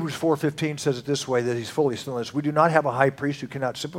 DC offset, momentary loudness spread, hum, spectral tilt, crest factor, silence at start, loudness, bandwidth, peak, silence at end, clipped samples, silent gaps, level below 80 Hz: under 0.1%; 9 LU; none; -5.5 dB/octave; 22 dB; 0 s; -24 LUFS; 16.5 kHz; -2 dBFS; 0 s; under 0.1%; none; -64 dBFS